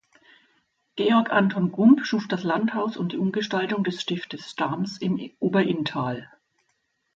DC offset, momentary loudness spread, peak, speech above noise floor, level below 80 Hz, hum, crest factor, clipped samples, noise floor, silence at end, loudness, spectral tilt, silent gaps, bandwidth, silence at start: under 0.1%; 10 LU; -4 dBFS; 50 dB; -70 dBFS; none; 20 dB; under 0.1%; -73 dBFS; 0.9 s; -24 LUFS; -6.5 dB/octave; none; 7.8 kHz; 0.95 s